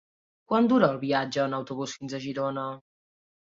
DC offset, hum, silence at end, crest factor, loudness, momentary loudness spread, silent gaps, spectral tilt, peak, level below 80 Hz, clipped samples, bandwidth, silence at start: under 0.1%; none; 0.8 s; 20 dB; -27 LUFS; 13 LU; none; -6 dB/octave; -8 dBFS; -70 dBFS; under 0.1%; 7.6 kHz; 0.5 s